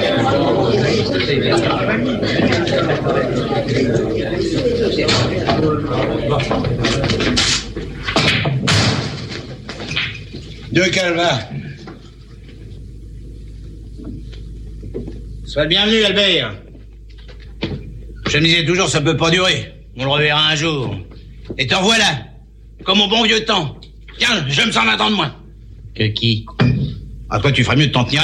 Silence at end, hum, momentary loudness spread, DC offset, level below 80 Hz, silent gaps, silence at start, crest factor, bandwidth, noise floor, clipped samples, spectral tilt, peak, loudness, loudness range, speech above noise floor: 0 s; none; 20 LU; under 0.1%; -36 dBFS; none; 0 s; 16 dB; 12 kHz; -39 dBFS; under 0.1%; -4.5 dB/octave; -2 dBFS; -16 LUFS; 5 LU; 24 dB